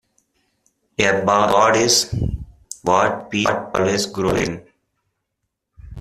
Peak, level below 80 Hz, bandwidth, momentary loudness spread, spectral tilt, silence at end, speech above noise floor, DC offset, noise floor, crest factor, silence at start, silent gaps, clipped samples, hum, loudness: -2 dBFS; -40 dBFS; 15 kHz; 13 LU; -3.5 dB/octave; 0 s; 59 dB; under 0.1%; -77 dBFS; 20 dB; 1 s; none; under 0.1%; none; -18 LUFS